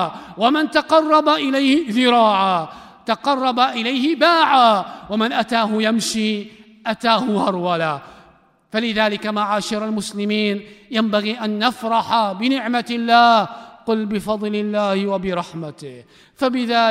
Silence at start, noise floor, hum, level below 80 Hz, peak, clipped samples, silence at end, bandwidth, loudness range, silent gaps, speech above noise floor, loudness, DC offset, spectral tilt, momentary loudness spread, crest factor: 0 s; -53 dBFS; none; -58 dBFS; -2 dBFS; under 0.1%; 0 s; 15 kHz; 5 LU; none; 35 dB; -18 LUFS; under 0.1%; -4.5 dB/octave; 12 LU; 16 dB